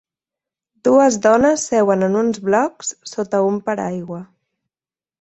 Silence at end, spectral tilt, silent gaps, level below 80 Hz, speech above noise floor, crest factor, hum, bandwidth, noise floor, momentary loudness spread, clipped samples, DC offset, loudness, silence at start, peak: 0.95 s; -5 dB/octave; none; -56 dBFS; over 73 dB; 16 dB; none; 8.4 kHz; under -90 dBFS; 13 LU; under 0.1%; under 0.1%; -17 LUFS; 0.85 s; -2 dBFS